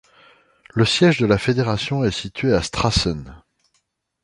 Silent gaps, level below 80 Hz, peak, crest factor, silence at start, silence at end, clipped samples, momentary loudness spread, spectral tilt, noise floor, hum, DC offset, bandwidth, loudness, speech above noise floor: none; -38 dBFS; -2 dBFS; 18 dB; 0.75 s; 0.85 s; under 0.1%; 8 LU; -5.5 dB/octave; -69 dBFS; none; under 0.1%; 11.5 kHz; -19 LUFS; 50 dB